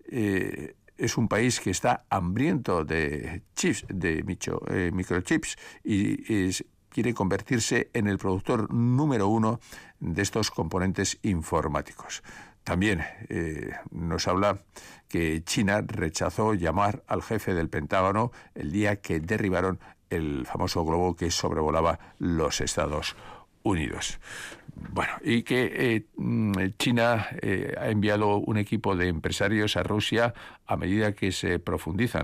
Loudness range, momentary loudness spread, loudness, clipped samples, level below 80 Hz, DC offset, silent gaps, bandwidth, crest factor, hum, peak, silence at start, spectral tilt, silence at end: 3 LU; 10 LU; -27 LUFS; under 0.1%; -50 dBFS; under 0.1%; none; 15.5 kHz; 14 dB; none; -14 dBFS; 0.05 s; -5 dB/octave; 0 s